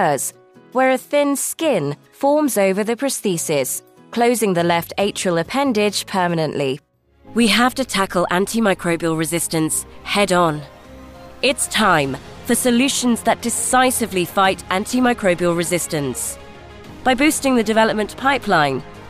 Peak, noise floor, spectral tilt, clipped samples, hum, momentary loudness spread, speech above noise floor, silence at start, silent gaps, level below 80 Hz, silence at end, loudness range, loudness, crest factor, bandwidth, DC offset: -4 dBFS; -45 dBFS; -3.5 dB/octave; under 0.1%; none; 7 LU; 27 dB; 0 s; none; -48 dBFS; 0 s; 2 LU; -18 LUFS; 14 dB; 15.5 kHz; under 0.1%